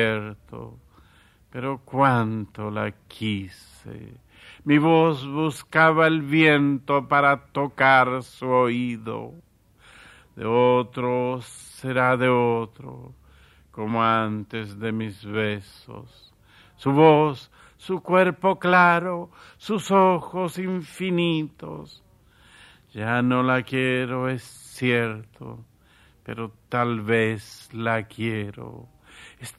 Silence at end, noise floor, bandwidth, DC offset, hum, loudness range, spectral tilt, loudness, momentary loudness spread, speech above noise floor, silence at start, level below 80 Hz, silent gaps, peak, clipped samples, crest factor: 0.1 s; -57 dBFS; 13.5 kHz; under 0.1%; none; 8 LU; -6.5 dB/octave; -22 LUFS; 23 LU; 34 dB; 0 s; -60 dBFS; none; -4 dBFS; under 0.1%; 20 dB